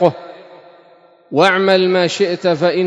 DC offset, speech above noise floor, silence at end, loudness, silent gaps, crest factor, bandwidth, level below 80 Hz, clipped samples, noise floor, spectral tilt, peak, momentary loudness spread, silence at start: under 0.1%; 34 dB; 0 s; -14 LUFS; none; 16 dB; 11 kHz; -66 dBFS; 0.1%; -48 dBFS; -5 dB/octave; 0 dBFS; 13 LU; 0 s